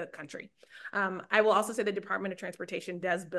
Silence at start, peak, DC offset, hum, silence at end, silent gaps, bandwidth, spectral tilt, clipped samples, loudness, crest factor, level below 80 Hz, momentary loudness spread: 0 s; -10 dBFS; under 0.1%; none; 0 s; none; 12.5 kHz; -4 dB/octave; under 0.1%; -31 LUFS; 22 dB; -80 dBFS; 19 LU